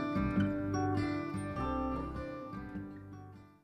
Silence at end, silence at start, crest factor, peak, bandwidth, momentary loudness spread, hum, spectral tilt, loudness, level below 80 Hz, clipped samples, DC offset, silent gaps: 0.1 s; 0 s; 16 dB; -20 dBFS; 10 kHz; 16 LU; none; -7.5 dB/octave; -36 LUFS; -50 dBFS; under 0.1%; under 0.1%; none